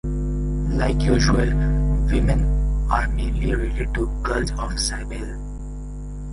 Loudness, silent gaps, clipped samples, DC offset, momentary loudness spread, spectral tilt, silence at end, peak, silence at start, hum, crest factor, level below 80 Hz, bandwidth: -23 LUFS; none; under 0.1%; under 0.1%; 15 LU; -5.5 dB/octave; 0 s; -2 dBFS; 0.05 s; 50 Hz at -20 dBFS; 18 dB; -22 dBFS; 11.5 kHz